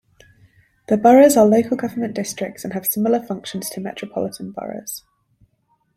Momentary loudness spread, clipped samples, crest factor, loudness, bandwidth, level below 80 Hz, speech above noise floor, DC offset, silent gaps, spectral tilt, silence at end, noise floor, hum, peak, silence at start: 19 LU; under 0.1%; 18 dB; -18 LUFS; 16.5 kHz; -60 dBFS; 47 dB; under 0.1%; none; -5 dB/octave; 1 s; -65 dBFS; none; -2 dBFS; 0.9 s